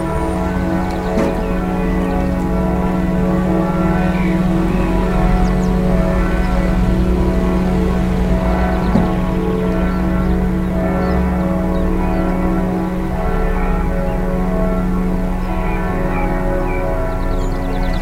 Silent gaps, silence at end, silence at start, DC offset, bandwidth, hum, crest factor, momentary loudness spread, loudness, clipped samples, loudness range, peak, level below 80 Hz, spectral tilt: none; 0 s; 0 s; under 0.1%; 15.5 kHz; none; 16 dB; 4 LU; -17 LUFS; under 0.1%; 3 LU; 0 dBFS; -20 dBFS; -8 dB/octave